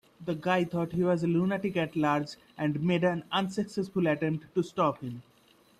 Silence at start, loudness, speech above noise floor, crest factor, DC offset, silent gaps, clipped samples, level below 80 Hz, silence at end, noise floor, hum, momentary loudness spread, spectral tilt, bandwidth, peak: 0.2 s; -30 LUFS; 33 dB; 16 dB; under 0.1%; none; under 0.1%; -66 dBFS; 0.6 s; -62 dBFS; none; 7 LU; -7 dB/octave; 12.5 kHz; -14 dBFS